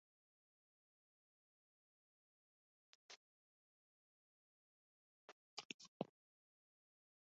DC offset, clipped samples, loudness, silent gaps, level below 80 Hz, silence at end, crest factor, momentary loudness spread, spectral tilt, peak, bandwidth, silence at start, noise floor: under 0.1%; under 0.1%; -56 LUFS; 3.16-5.57 s, 5.65-5.79 s, 5.88-6.00 s; under -90 dBFS; 1.3 s; 38 dB; 14 LU; -3 dB/octave; -26 dBFS; 7 kHz; 3.1 s; under -90 dBFS